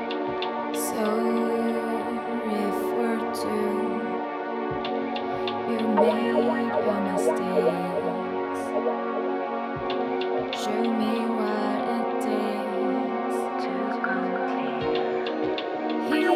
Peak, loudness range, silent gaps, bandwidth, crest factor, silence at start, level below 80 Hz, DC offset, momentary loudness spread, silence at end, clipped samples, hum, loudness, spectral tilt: -8 dBFS; 3 LU; none; 15.5 kHz; 18 dB; 0 s; -64 dBFS; under 0.1%; 5 LU; 0 s; under 0.1%; none; -26 LUFS; -5 dB/octave